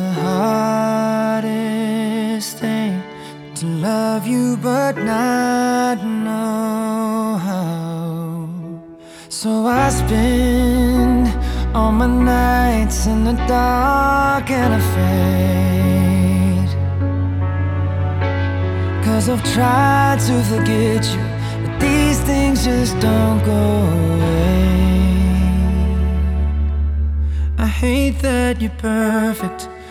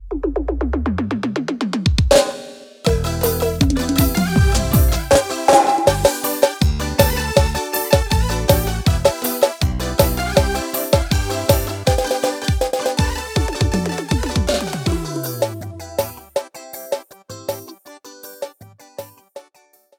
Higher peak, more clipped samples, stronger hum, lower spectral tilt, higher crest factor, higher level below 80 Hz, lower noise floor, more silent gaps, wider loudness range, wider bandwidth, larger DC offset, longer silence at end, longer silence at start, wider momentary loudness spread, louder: about the same, -2 dBFS vs 0 dBFS; neither; neither; about the same, -6 dB/octave vs -5 dB/octave; about the same, 14 dB vs 18 dB; about the same, -24 dBFS vs -26 dBFS; second, -38 dBFS vs -55 dBFS; neither; second, 5 LU vs 11 LU; about the same, 17 kHz vs 18.5 kHz; neither; second, 0 s vs 0.55 s; about the same, 0 s vs 0 s; second, 7 LU vs 16 LU; about the same, -17 LUFS vs -18 LUFS